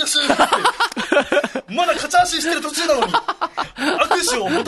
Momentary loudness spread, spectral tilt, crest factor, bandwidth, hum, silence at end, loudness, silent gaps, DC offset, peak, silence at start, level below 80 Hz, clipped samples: 7 LU; -1.5 dB/octave; 16 dB; 12.5 kHz; none; 0 s; -18 LUFS; none; under 0.1%; -2 dBFS; 0 s; -50 dBFS; under 0.1%